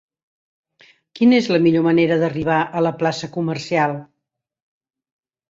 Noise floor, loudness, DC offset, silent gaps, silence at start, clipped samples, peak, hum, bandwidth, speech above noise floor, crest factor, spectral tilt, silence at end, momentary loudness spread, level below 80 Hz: -80 dBFS; -18 LUFS; under 0.1%; none; 1.15 s; under 0.1%; -4 dBFS; none; 7.8 kHz; 62 dB; 16 dB; -6.5 dB/octave; 1.45 s; 9 LU; -60 dBFS